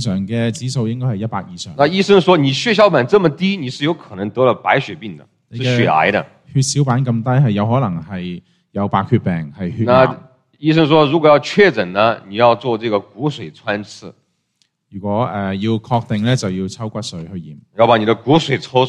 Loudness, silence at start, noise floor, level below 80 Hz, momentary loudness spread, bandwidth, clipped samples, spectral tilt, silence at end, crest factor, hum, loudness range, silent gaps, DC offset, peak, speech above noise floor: -16 LUFS; 0 s; -64 dBFS; -52 dBFS; 15 LU; 11 kHz; under 0.1%; -6 dB/octave; 0 s; 16 dB; none; 7 LU; none; under 0.1%; 0 dBFS; 49 dB